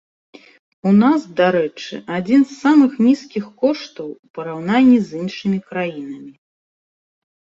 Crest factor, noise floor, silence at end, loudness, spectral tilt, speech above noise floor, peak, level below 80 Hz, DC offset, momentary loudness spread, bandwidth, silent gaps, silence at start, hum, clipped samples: 16 dB; under -90 dBFS; 1.15 s; -17 LUFS; -7 dB/octave; over 73 dB; -2 dBFS; -62 dBFS; under 0.1%; 17 LU; 7.6 kHz; 4.19-4.23 s, 4.30-4.34 s; 0.85 s; none; under 0.1%